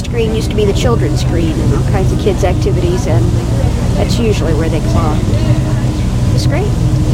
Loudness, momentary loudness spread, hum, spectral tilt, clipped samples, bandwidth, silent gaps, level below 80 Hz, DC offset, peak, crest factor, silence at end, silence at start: -13 LUFS; 2 LU; none; -7 dB/octave; under 0.1%; 15 kHz; none; -18 dBFS; 0.3%; 0 dBFS; 12 dB; 0 s; 0 s